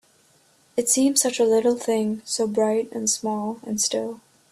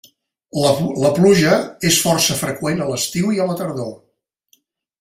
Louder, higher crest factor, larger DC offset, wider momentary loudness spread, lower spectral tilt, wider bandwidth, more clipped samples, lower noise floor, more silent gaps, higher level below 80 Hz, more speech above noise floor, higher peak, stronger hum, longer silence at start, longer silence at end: second, -22 LUFS vs -17 LUFS; about the same, 20 dB vs 16 dB; neither; about the same, 10 LU vs 12 LU; about the same, -3 dB/octave vs -4 dB/octave; about the same, 15.5 kHz vs 16 kHz; neither; about the same, -59 dBFS vs -61 dBFS; neither; second, -68 dBFS vs -52 dBFS; second, 37 dB vs 44 dB; about the same, -4 dBFS vs -2 dBFS; neither; first, 0.75 s vs 0.55 s; second, 0.35 s vs 1.05 s